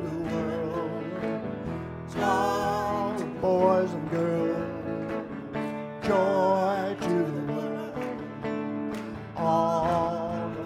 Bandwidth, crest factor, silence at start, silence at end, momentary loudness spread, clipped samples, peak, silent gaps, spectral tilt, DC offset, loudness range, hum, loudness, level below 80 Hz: 16 kHz; 18 dB; 0 s; 0 s; 10 LU; under 0.1%; -10 dBFS; none; -7 dB/octave; under 0.1%; 2 LU; none; -28 LUFS; -58 dBFS